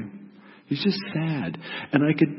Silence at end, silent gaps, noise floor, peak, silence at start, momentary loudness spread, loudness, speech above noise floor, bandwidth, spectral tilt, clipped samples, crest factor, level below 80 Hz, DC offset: 0 s; none; -48 dBFS; -4 dBFS; 0 s; 14 LU; -26 LUFS; 24 dB; 5.8 kHz; -10.5 dB/octave; under 0.1%; 22 dB; -68 dBFS; under 0.1%